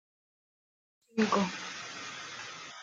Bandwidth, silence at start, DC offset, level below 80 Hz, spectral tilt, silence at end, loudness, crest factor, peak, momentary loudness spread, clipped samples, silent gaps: 9 kHz; 1.15 s; under 0.1%; -78 dBFS; -4 dB/octave; 0 s; -34 LUFS; 22 dB; -14 dBFS; 13 LU; under 0.1%; none